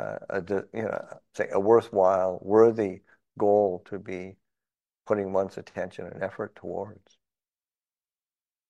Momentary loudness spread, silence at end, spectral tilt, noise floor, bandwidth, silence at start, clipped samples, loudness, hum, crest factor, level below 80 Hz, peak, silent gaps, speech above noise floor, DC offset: 16 LU; 1.75 s; -7.5 dB/octave; under -90 dBFS; 8.8 kHz; 0 s; under 0.1%; -27 LUFS; none; 22 dB; -70 dBFS; -6 dBFS; none; over 64 dB; under 0.1%